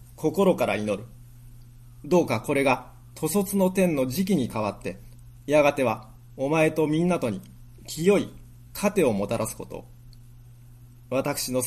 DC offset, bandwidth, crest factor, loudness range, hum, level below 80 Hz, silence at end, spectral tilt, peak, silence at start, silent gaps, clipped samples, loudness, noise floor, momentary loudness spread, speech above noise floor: under 0.1%; 14.5 kHz; 18 dB; 3 LU; none; -52 dBFS; 0 s; -5.5 dB/octave; -8 dBFS; 0.2 s; none; under 0.1%; -25 LUFS; -48 dBFS; 16 LU; 24 dB